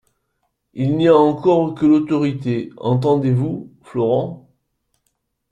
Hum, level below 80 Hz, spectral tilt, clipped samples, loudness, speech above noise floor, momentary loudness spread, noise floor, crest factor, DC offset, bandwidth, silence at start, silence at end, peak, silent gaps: none; -56 dBFS; -9 dB/octave; under 0.1%; -17 LUFS; 55 dB; 12 LU; -71 dBFS; 16 dB; under 0.1%; 8.6 kHz; 0.75 s; 1.15 s; -2 dBFS; none